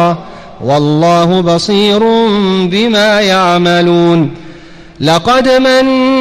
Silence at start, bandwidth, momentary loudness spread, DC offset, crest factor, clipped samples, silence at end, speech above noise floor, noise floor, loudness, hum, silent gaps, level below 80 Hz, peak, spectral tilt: 0 s; 14 kHz; 5 LU; under 0.1%; 10 dB; under 0.1%; 0 s; 24 dB; -32 dBFS; -9 LUFS; none; none; -42 dBFS; 0 dBFS; -5.5 dB/octave